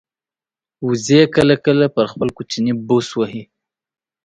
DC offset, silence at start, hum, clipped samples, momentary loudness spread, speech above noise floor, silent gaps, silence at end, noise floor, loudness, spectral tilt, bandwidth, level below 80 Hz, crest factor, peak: under 0.1%; 0.8 s; none; under 0.1%; 11 LU; over 74 dB; none; 0.8 s; under -90 dBFS; -16 LUFS; -5.5 dB/octave; 11 kHz; -52 dBFS; 18 dB; 0 dBFS